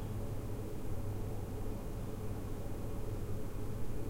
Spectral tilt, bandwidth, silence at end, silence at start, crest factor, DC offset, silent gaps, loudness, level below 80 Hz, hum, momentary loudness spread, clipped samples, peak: -7 dB/octave; 16 kHz; 0 s; 0 s; 12 dB; under 0.1%; none; -43 LUFS; -44 dBFS; none; 2 LU; under 0.1%; -26 dBFS